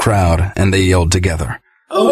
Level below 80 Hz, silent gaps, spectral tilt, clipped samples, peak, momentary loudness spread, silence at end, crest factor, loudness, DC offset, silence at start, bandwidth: -26 dBFS; none; -5.5 dB/octave; under 0.1%; 0 dBFS; 10 LU; 0 s; 12 dB; -15 LUFS; under 0.1%; 0 s; 14 kHz